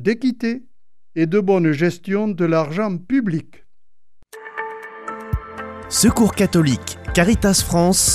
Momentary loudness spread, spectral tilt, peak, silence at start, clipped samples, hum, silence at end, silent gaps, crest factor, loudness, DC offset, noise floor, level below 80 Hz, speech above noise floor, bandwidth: 16 LU; -4.5 dB/octave; -2 dBFS; 0 s; under 0.1%; none; 0 s; none; 18 dB; -18 LUFS; under 0.1%; -76 dBFS; -36 dBFS; 58 dB; 15.5 kHz